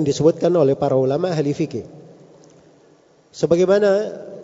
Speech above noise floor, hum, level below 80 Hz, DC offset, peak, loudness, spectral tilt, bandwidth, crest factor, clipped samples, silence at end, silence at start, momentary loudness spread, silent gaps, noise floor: 35 dB; none; -56 dBFS; under 0.1%; -4 dBFS; -18 LUFS; -7 dB/octave; 7.8 kHz; 16 dB; under 0.1%; 0 s; 0 s; 11 LU; none; -53 dBFS